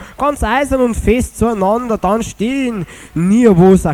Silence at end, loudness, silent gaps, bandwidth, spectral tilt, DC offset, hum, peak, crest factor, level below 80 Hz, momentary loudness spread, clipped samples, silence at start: 0 s; -14 LUFS; none; 15.5 kHz; -6.5 dB/octave; under 0.1%; none; 0 dBFS; 12 dB; -28 dBFS; 9 LU; under 0.1%; 0 s